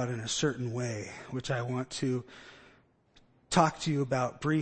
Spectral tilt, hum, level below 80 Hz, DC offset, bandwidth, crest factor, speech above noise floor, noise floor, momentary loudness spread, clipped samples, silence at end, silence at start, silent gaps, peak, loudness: -5 dB/octave; none; -60 dBFS; under 0.1%; 8.8 kHz; 24 dB; 33 dB; -64 dBFS; 13 LU; under 0.1%; 0 s; 0 s; none; -8 dBFS; -32 LUFS